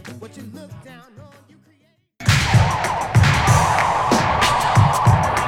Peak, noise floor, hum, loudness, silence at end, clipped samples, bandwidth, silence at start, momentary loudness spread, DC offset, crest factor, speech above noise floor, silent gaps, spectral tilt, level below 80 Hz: -2 dBFS; -60 dBFS; none; -16 LUFS; 0 s; under 0.1%; 16.5 kHz; 0.05 s; 22 LU; under 0.1%; 16 dB; 22 dB; none; -5 dB/octave; -34 dBFS